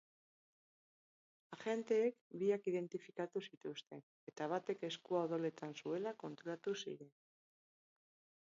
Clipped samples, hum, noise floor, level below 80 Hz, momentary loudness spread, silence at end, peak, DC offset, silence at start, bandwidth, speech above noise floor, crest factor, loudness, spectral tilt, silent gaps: under 0.1%; none; under -90 dBFS; under -90 dBFS; 13 LU; 1.4 s; -26 dBFS; under 0.1%; 1.5 s; 7.4 kHz; over 48 dB; 18 dB; -43 LUFS; -4.5 dB/octave; 2.21-2.30 s, 3.57-3.61 s, 4.03-4.27 s